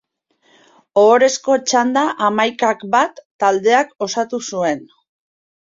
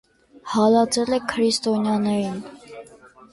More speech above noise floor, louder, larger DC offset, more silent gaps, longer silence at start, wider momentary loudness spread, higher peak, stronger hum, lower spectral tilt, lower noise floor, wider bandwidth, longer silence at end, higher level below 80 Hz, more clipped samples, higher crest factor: first, 45 dB vs 28 dB; first, -16 LUFS vs -21 LUFS; neither; first, 3.25-3.39 s vs none; first, 0.95 s vs 0.45 s; second, 9 LU vs 24 LU; first, -2 dBFS vs -6 dBFS; neither; second, -3 dB/octave vs -4.5 dB/octave; first, -60 dBFS vs -48 dBFS; second, 7.8 kHz vs 11.5 kHz; first, 0.85 s vs 0.5 s; second, -66 dBFS vs -60 dBFS; neither; about the same, 16 dB vs 16 dB